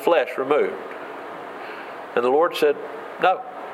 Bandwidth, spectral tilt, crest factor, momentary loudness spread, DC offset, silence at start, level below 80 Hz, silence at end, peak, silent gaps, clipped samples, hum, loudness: 15 kHz; -4.5 dB/octave; 18 dB; 15 LU; under 0.1%; 0 s; -78 dBFS; 0 s; -4 dBFS; none; under 0.1%; none; -22 LUFS